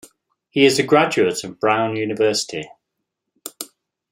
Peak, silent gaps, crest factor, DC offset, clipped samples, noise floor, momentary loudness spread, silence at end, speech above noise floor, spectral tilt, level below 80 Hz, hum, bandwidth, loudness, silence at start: -2 dBFS; none; 18 dB; under 0.1%; under 0.1%; -79 dBFS; 19 LU; 0.45 s; 61 dB; -4 dB/octave; -66 dBFS; none; 16 kHz; -18 LUFS; 0.55 s